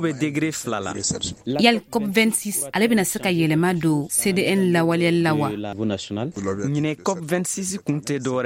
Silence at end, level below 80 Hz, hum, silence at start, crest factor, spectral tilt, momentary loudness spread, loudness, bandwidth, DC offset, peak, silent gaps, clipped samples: 0 s; -56 dBFS; none; 0 s; 20 dB; -4.5 dB/octave; 8 LU; -22 LUFS; 16.5 kHz; under 0.1%; -2 dBFS; none; under 0.1%